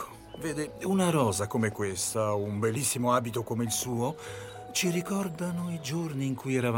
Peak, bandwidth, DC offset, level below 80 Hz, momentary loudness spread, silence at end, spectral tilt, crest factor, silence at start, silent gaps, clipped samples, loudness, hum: -12 dBFS; 17 kHz; under 0.1%; -62 dBFS; 8 LU; 0 s; -4.5 dB/octave; 18 dB; 0 s; none; under 0.1%; -30 LUFS; none